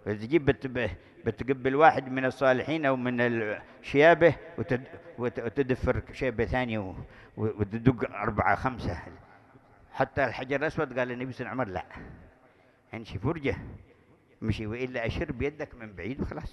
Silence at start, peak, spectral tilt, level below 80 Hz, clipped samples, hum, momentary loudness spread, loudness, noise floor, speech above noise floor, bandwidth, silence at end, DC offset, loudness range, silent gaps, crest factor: 0.05 s; -6 dBFS; -7.5 dB/octave; -48 dBFS; under 0.1%; none; 18 LU; -28 LUFS; -61 dBFS; 32 dB; 11.5 kHz; 0.05 s; under 0.1%; 10 LU; none; 22 dB